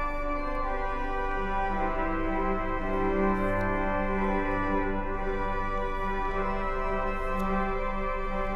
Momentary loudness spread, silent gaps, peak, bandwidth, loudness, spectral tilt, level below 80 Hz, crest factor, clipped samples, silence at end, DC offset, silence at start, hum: 4 LU; none; -16 dBFS; 6.2 kHz; -30 LUFS; -7.5 dB/octave; -32 dBFS; 12 dB; under 0.1%; 0 s; under 0.1%; 0 s; none